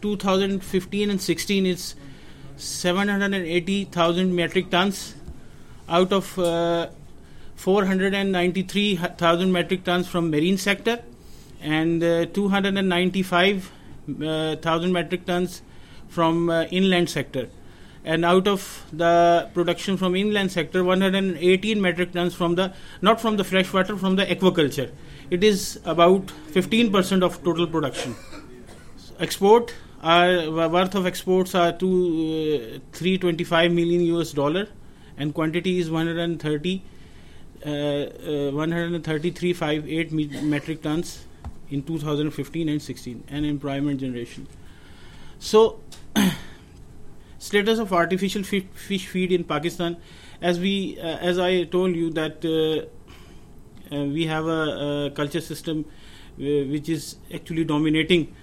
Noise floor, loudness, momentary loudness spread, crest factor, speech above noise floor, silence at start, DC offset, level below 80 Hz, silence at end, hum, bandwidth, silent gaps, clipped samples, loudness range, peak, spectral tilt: -44 dBFS; -23 LUFS; 12 LU; 20 dB; 21 dB; 0 s; under 0.1%; -48 dBFS; 0 s; none; 16.5 kHz; none; under 0.1%; 6 LU; -4 dBFS; -5.5 dB/octave